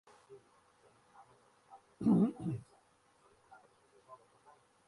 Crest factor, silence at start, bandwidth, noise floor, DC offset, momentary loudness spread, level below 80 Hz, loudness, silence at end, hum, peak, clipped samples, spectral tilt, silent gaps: 22 dB; 0.3 s; 11.5 kHz; -70 dBFS; under 0.1%; 30 LU; -72 dBFS; -34 LUFS; 0.7 s; none; -20 dBFS; under 0.1%; -9.5 dB/octave; none